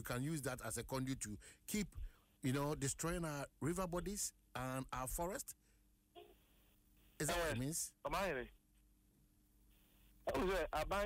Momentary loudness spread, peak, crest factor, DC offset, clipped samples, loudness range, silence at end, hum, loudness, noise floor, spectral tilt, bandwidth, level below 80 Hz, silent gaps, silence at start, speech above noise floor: 9 LU; -28 dBFS; 16 dB; under 0.1%; under 0.1%; 3 LU; 0 s; none; -43 LUFS; -74 dBFS; -4.5 dB/octave; 16 kHz; -56 dBFS; none; 0 s; 31 dB